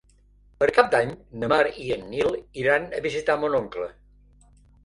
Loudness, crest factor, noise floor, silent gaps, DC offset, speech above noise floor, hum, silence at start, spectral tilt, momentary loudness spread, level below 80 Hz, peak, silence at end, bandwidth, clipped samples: -24 LUFS; 22 dB; -57 dBFS; none; under 0.1%; 33 dB; 50 Hz at -55 dBFS; 0.6 s; -5 dB/octave; 11 LU; -54 dBFS; -2 dBFS; 0.95 s; 11 kHz; under 0.1%